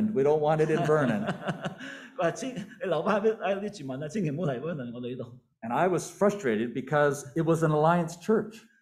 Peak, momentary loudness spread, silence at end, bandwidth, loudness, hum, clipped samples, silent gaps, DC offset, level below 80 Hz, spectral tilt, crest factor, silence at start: -10 dBFS; 13 LU; 0.25 s; 14.5 kHz; -28 LUFS; none; under 0.1%; none; under 0.1%; -66 dBFS; -6.5 dB/octave; 18 dB; 0 s